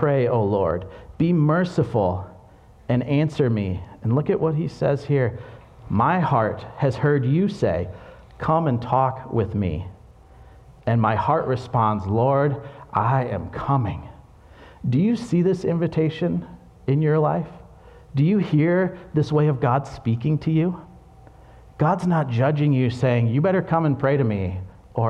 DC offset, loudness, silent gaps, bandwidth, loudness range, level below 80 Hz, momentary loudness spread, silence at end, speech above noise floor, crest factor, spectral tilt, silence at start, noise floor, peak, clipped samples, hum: under 0.1%; -22 LUFS; none; 8.4 kHz; 2 LU; -48 dBFS; 10 LU; 0 s; 28 dB; 16 dB; -9 dB/octave; 0 s; -48 dBFS; -6 dBFS; under 0.1%; none